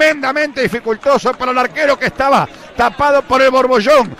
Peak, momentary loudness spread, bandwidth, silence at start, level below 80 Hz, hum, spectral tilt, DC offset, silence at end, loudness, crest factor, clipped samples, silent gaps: -2 dBFS; 6 LU; 15.5 kHz; 0 s; -42 dBFS; none; -4.5 dB/octave; under 0.1%; 0.05 s; -13 LUFS; 10 dB; under 0.1%; none